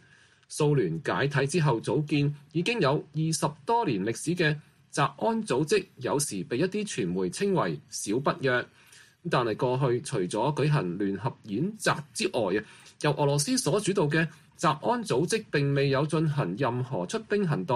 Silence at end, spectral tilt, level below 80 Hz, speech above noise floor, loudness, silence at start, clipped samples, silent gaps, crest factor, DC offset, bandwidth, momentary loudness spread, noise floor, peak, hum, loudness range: 0 s; -5.5 dB/octave; -64 dBFS; 32 dB; -28 LUFS; 0.5 s; under 0.1%; none; 16 dB; under 0.1%; 13 kHz; 5 LU; -59 dBFS; -10 dBFS; none; 2 LU